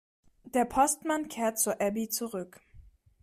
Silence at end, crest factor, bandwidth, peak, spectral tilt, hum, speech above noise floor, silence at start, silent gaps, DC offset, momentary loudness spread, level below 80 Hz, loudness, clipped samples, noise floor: 0.4 s; 18 dB; 15.5 kHz; -12 dBFS; -3 dB/octave; none; 26 dB; 0.45 s; none; under 0.1%; 11 LU; -60 dBFS; -30 LUFS; under 0.1%; -56 dBFS